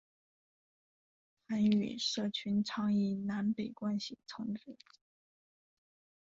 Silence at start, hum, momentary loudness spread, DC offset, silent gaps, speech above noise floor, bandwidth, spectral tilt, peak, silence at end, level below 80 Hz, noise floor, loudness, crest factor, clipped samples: 1.5 s; none; 12 LU; under 0.1%; none; over 55 dB; 7.8 kHz; -5.5 dB/octave; -18 dBFS; 1.65 s; -76 dBFS; under -90 dBFS; -35 LUFS; 20 dB; under 0.1%